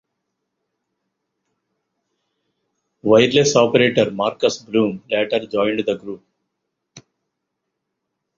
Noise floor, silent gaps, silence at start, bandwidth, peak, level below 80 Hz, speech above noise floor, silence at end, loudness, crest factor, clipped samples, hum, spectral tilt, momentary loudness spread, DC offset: -78 dBFS; none; 3.05 s; 7.6 kHz; -2 dBFS; -60 dBFS; 61 dB; 1.4 s; -18 LUFS; 20 dB; under 0.1%; none; -4.5 dB/octave; 12 LU; under 0.1%